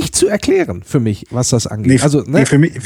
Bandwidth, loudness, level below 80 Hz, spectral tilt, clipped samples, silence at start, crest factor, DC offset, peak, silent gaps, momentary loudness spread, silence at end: 17 kHz; -14 LUFS; -42 dBFS; -5.5 dB/octave; under 0.1%; 0 s; 14 dB; under 0.1%; 0 dBFS; none; 6 LU; 0 s